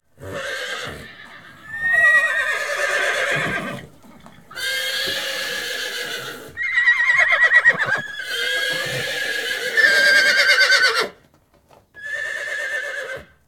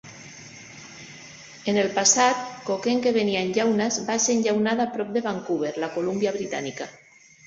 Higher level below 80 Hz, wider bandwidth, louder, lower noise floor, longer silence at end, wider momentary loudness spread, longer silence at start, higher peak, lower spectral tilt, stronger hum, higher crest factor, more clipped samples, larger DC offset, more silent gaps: first, -60 dBFS vs -66 dBFS; first, 17.5 kHz vs 8.4 kHz; first, -17 LUFS vs -23 LUFS; first, -56 dBFS vs -44 dBFS; second, 0.25 s vs 0.55 s; second, 17 LU vs 22 LU; first, 0.2 s vs 0.05 s; first, -2 dBFS vs -6 dBFS; second, -1 dB/octave vs -3 dB/octave; neither; about the same, 18 dB vs 18 dB; neither; first, 0.3% vs under 0.1%; neither